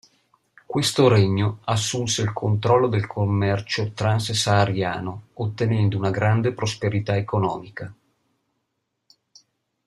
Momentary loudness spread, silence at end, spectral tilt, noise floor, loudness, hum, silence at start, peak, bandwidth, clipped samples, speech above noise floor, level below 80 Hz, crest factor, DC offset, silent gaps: 11 LU; 1.95 s; -5.5 dB/octave; -77 dBFS; -22 LUFS; none; 0.7 s; -4 dBFS; 12.5 kHz; under 0.1%; 55 dB; -56 dBFS; 18 dB; under 0.1%; none